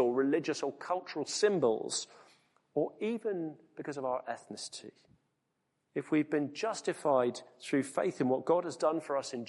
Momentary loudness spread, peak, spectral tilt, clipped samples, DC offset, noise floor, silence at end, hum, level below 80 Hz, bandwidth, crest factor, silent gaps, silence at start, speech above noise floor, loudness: 13 LU; -16 dBFS; -4.5 dB/octave; under 0.1%; under 0.1%; -81 dBFS; 0 s; none; -82 dBFS; 11.5 kHz; 18 dB; none; 0 s; 48 dB; -34 LUFS